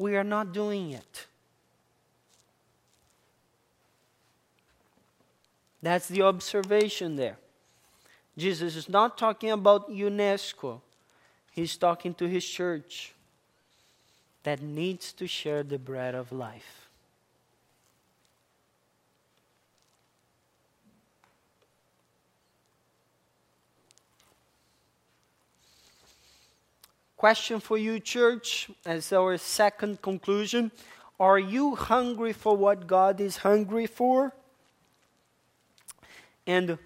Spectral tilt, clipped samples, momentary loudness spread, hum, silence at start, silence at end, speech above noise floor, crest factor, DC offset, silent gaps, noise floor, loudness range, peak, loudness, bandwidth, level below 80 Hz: -4.5 dB/octave; under 0.1%; 17 LU; none; 0 s; 0.1 s; 44 dB; 26 dB; under 0.1%; none; -71 dBFS; 11 LU; -6 dBFS; -27 LUFS; 16 kHz; -68 dBFS